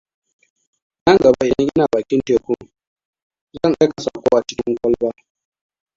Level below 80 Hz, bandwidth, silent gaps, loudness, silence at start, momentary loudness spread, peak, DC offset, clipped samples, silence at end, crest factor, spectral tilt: -50 dBFS; 7.6 kHz; 2.87-2.96 s, 3.05-3.13 s, 3.22-3.30 s, 3.41-3.47 s; -17 LUFS; 1.05 s; 9 LU; 0 dBFS; under 0.1%; under 0.1%; 0.85 s; 18 dB; -6 dB/octave